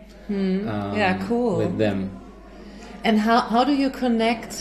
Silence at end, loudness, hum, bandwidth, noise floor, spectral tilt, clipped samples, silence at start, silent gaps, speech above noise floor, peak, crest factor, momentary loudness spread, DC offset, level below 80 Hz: 0 s; -22 LUFS; none; 13 kHz; -42 dBFS; -6 dB/octave; under 0.1%; 0 s; none; 20 dB; -6 dBFS; 18 dB; 14 LU; under 0.1%; -48 dBFS